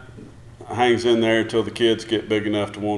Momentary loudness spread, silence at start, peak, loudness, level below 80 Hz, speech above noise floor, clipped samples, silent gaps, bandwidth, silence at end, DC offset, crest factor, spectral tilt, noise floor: 6 LU; 0 s; -4 dBFS; -20 LUFS; -52 dBFS; 21 dB; under 0.1%; none; 11.5 kHz; 0 s; under 0.1%; 18 dB; -5.5 dB/octave; -41 dBFS